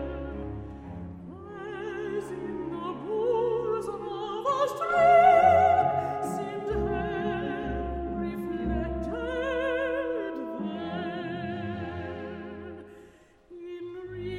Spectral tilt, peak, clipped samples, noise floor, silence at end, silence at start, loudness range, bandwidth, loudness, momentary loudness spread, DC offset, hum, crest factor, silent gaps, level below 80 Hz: -6.5 dB/octave; -8 dBFS; under 0.1%; -55 dBFS; 0 s; 0 s; 13 LU; 13.5 kHz; -28 LUFS; 20 LU; under 0.1%; none; 20 dB; none; -46 dBFS